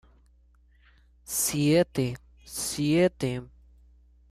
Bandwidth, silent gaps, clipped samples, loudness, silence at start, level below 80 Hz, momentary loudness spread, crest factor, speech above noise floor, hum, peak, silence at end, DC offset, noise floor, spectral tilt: 15.5 kHz; none; under 0.1%; -27 LUFS; 1.3 s; -54 dBFS; 13 LU; 18 dB; 34 dB; 60 Hz at -50 dBFS; -10 dBFS; 0.85 s; under 0.1%; -60 dBFS; -4.5 dB/octave